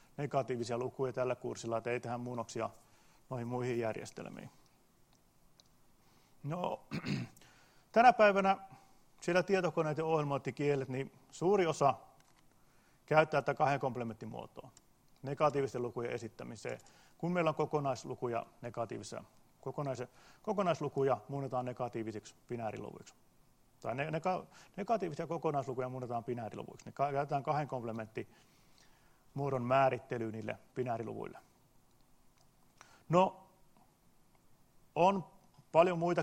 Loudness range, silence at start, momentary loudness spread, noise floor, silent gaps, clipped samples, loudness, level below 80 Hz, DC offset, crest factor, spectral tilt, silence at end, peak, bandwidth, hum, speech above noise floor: 9 LU; 0.2 s; 16 LU; -68 dBFS; none; under 0.1%; -35 LUFS; -72 dBFS; under 0.1%; 26 dB; -6.5 dB/octave; 0 s; -10 dBFS; 15.5 kHz; none; 33 dB